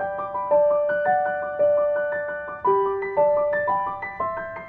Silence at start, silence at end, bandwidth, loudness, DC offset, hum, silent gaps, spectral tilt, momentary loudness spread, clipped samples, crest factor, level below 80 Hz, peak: 0 s; 0 s; 3.8 kHz; -23 LUFS; under 0.1%; none; none; -8.5 dB/octave; 8 LU; under 0.1%; 14 dB; -58 dBFS; -10 dBFS